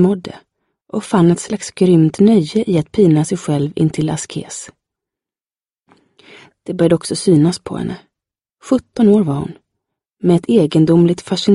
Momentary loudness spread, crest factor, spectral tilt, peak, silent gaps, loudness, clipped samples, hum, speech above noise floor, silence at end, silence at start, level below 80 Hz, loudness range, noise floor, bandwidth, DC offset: 14 LU; 14 dB; -7 dB/octave; 0 dBFS; none; -15 LUFS; under 0.1%; none; over 76 dB; 0 s; 0 s; -50 dBFS; 8 LU; under -90 dBFS; 11.5 kHz; under 0.1%